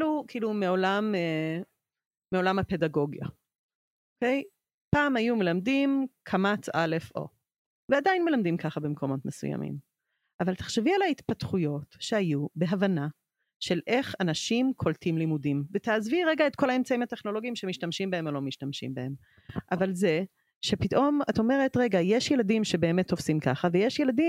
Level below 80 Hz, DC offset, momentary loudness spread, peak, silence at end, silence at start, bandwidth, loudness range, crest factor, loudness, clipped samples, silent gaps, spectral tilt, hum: -62 dBFS; under 0.1%; 10 LU; -10 dBFS; 0 s; 0 s; 15.5 kHz; 5 LU; 18 dB; -28 LUFS; under 0.1%; 2.06-2.11 s, 3.59-3.69 s, 3.75-4.16 s, 4.74-4.91 s, 7.58-7.88 s, 10.34-10.39 s, 13.56-13.60 s, 20.55-20.61 s; -6 dB/octave; none